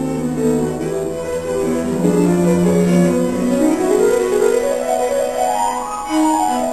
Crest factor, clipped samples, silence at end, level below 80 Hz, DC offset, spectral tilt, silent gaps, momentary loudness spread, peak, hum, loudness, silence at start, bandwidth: 14 dB; under 0.1%; 0 s; -44 dBFS; 0.6%; -6 dB/octave; none; 7 LU; -2 dBFS; none; -16 LUFS; 0 s; 13.5 kHz